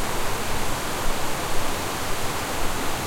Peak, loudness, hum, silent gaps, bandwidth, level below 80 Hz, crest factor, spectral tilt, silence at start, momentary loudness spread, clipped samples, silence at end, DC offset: -8 dBFS; -27 LUFS; none; none; 16.5 kHz; -32 dBFS; 14 dB; -3 dB/octave; 0 s; 0 LU; under 0.1%; 0 s; under 0.1%